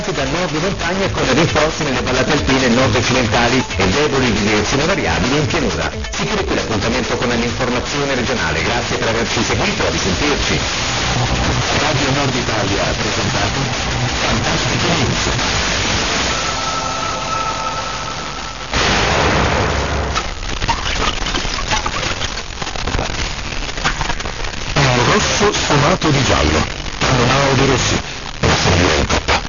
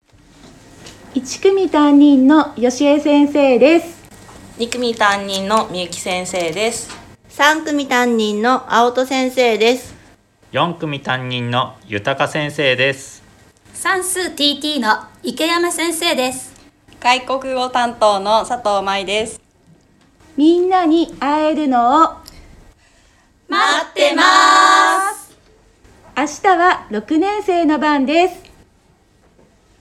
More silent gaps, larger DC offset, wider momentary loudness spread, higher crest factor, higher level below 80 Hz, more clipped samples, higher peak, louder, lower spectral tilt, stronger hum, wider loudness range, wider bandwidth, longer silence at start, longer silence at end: neither; first, 2% vs under 0.1%; second, 7 LU vs 12 LU; about the same, 16 dB vs 16 dB; first, -28 dBFS vs -52 dBFS; neither; about the same, -2 dBFS vs 0 dBFS; about the same, -16 LUFS vs -15 LUFS; about the same, -4 dB/octave vs -3.5 dB/octave; neither; about the same, 4 LU vs 5 LU; second, 7.4 kHz vs 14 kHz; second, 0 s vs 0.85 s; second, 0 s vs 1.4 s